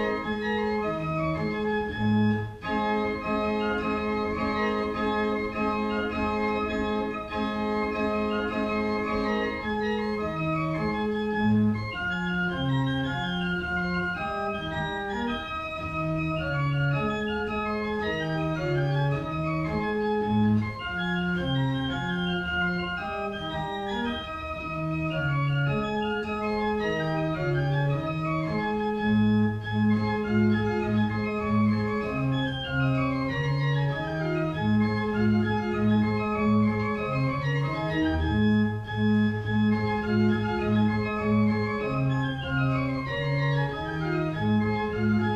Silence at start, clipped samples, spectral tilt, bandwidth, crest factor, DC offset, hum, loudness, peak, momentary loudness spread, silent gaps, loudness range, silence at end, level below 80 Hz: 0 s; under 0.1%; -8 dB/octave; 8 kHz; 12 dB; under 0.1%; none; -27 LUFS; -14 dBFS; 5 LU; none; 3 LU; 0 s; -46 dBFS